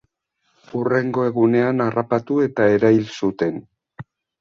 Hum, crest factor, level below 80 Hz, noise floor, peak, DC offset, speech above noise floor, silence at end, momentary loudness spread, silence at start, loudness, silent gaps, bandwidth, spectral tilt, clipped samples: none; 16 dB; -60 dBFS; -69 dBFS; -4 dBFS; under 0.1%; 51 dB; 0.4 s; 9 LU; 0.75 s; -19 LUFS; none; 7.2 kHz; -8 dB/octave; under 0.1%